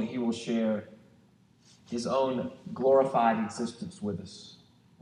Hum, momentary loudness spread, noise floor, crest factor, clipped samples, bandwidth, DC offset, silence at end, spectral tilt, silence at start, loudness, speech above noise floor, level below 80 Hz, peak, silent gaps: none; 15 LU; -62 dBFS; 18 dB; under 0.1%; 10.5 kHz; under 0.1%; 0.45 s; -6 dB/octave; 0 s; -29 LUFS; 33 dB; -72 dBFS; -12 dBFS; none